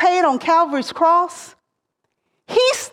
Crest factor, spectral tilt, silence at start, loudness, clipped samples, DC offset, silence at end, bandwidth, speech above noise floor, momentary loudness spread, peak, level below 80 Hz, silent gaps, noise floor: 16 dB; -2 dB/octave; 0 s; -17 LUFS; under 0.1%; under 0.1%; 0.05 s; 16 kHz; 58 dB; 7 LU; -4 dBFS; -66 dBFS; none; -75 dBFS